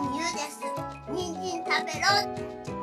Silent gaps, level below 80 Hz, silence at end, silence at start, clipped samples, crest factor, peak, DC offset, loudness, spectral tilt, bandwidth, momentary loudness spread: none; -56 dBFS; 0 s; 0 s; under 0.1%; 18 dB; -10 dBFS; under 0.1%; -29 LUFS; -3 dB/octave; 14.5 kHz; 12 LU